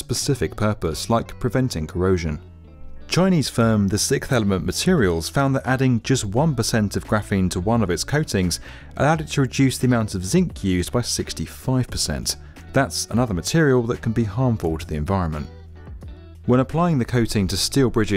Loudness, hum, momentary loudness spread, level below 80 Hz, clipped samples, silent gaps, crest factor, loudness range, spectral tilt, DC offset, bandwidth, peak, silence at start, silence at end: -21 LUFS; none; 8 LU; -38 dBFS; under 0.1%; none; 16 dB; 3 LU; -5.5 dB/octave; under 0.1%; 16 kHz; -6 dBFS; 0 s; 0 s